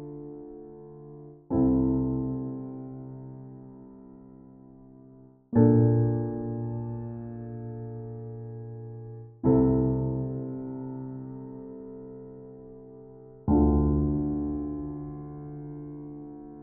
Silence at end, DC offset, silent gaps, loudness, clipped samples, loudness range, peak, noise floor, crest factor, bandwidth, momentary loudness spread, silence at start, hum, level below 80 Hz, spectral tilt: 0 s; under 0.1%; none; -28 LUFS; under 0.1%; 9 LU; -8 dBFS; -53 dBFS; 22 dB; 2 kHz; 24 LU; 0 s; none; -42 dBFS; -11 dB/octave